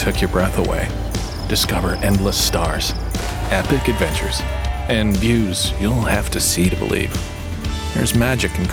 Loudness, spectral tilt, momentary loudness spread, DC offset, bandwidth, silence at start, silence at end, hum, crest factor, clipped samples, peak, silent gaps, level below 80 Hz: -19 LUFS; -4.5 dB/octave; 7 LU; under 0.1%; 17.5 kHz; 0 s; 0 s; none; 16 dB; under 0.1%; -2 dBFS; none; -26 dBFS